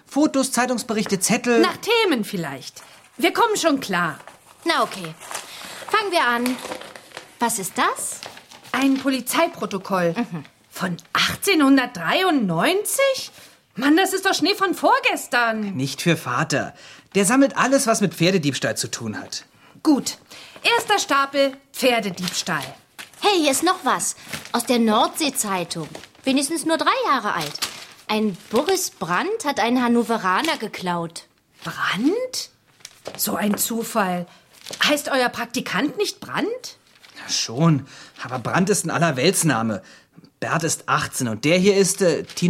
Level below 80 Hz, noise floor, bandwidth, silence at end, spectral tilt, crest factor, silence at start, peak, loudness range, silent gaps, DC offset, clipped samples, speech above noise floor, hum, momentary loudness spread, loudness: -64 dBFS; -47 dBFS; 16.5 kHz; 0 s; -3.5 dB/octave; 20 dB; 0.1 s; -2 dBFS; 4 LU; none; under 0.1%; under 0.1%; 26 dB; none; 15 LU; -21 LUFS